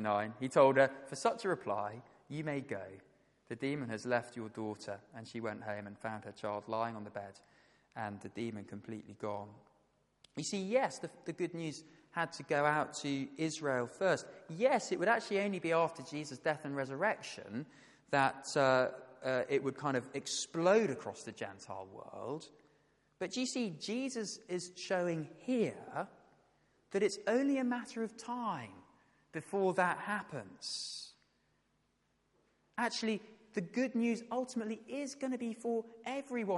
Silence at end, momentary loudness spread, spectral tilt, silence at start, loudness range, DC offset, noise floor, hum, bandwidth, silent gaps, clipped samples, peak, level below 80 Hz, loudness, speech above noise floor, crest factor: 0 s; 15 LU; -4.5 dB/octave; 0 s; 8 LU; under 0.1%; -78 dBFS; none; 11.5 kHz; none; under 0.1%; -14 dBFS; -82 dBFS; -37 LUFS; 41 dB; 24 dB